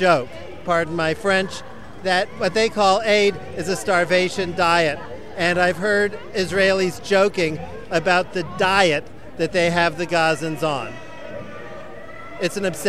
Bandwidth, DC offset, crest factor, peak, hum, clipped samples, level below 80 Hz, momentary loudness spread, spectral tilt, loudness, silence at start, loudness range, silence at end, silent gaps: 15 kHz; 1%; 18 dB; -2 dBFS; none; under 0.1%; -50 dBFS; 17 LU; -4 dB/octave; -20 LUFS; 0 s; 3 LU; 0 s; none